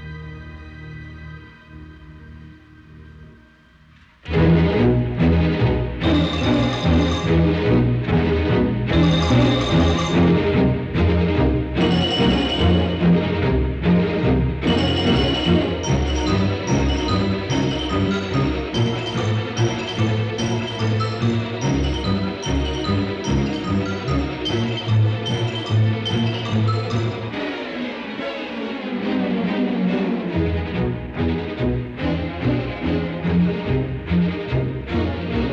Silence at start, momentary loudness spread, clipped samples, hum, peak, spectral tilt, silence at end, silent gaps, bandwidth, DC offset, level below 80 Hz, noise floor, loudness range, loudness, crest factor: 0 s; 8 LU; under 0.1%; none; -4 dBFS; -6.5 dB/octave; 0 s; none; 8.4 kHz; under 0.1%; -32 dBFS; -50 dBFS; 5 LU; -20 LUFS; 14 dB